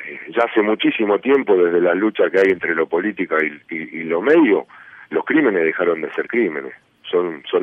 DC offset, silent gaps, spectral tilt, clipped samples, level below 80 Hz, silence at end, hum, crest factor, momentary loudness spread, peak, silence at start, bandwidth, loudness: under 0.1%; none; -7 dB/octave; under 0.1%; -68 dBFS; 0 s; none; 14 dB; 10 LU; -4 dBFS; 0 s; 6 kHz; -18 LUFS